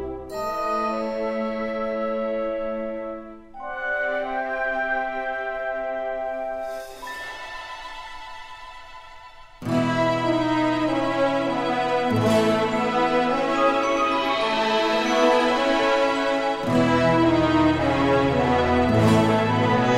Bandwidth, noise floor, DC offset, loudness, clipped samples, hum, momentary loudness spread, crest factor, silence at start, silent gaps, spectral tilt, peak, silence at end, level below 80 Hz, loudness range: 16 kHz; -44 dBFS; under 0.1%; -22 LUFS; under 0.1%; none; 16 LU; 16 dB; 0 s; none; -6 dB/octave; -6 dBFS; 0 s; -46 dBFS; 11 LU